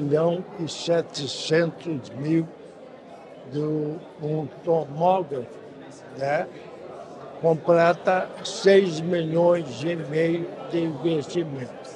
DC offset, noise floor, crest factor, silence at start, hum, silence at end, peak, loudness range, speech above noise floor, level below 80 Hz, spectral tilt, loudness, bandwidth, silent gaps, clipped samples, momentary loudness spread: under 0.1%; -44 dBFS; 20 dB; 0 s; none; 0 s; -6 dBFS; 6 LU; 20 dB; -70 dBFS; -6 dB/octave; -24 LUFS; 10 kHz; none; under 0.1%; 21 LU